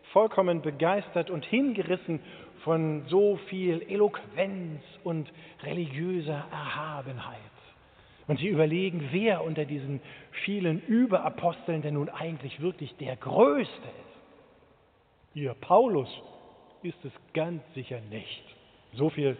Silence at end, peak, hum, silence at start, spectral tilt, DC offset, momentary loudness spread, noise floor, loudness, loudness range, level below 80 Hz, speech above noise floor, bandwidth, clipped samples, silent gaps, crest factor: 0 s; -8 dBFS; none; 0.05 s; -5.5 dB/octave; under 0.1%; 17 LU; -64 dBFS; -29 LUFS; 6 LU; -70 dBFS; 35 dB; 4.6 kHz; under 0.1%; none; 22 dB